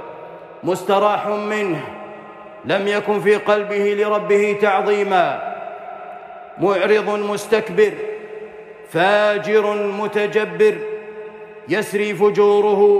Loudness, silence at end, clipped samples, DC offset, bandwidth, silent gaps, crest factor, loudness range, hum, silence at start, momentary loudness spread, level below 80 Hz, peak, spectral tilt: -18 LUFS; 0 s; under 0.1%; under 0.1%; 13.5 kHz; none; 14 dB; 3 LU; none; 0 s; 19 LU; -66 dBFS; -4 dBFS; -5 dB/octave